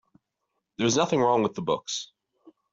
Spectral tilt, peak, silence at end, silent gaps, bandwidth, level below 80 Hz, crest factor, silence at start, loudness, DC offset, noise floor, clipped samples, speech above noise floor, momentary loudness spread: -4 dB/octave; -8 dBFS; 0.65 s; none; 8 kHz; -66 dBFS; 20 dB; 0.8 s; -25 LUFS; under 0.1%; -81 dBFS; under 0.1%; 56 dB; 15 LU